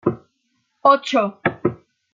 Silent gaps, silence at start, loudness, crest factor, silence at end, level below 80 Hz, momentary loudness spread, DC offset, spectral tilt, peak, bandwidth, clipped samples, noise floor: none; 0.05 s; -19 LUFS; 18 dB; 0.4 s; -60 dBFS; 10 LU; under 0.1%; -6 dB/octave; -2 dBFS; 7.6 kHz; under 0.1%; -69 dBFS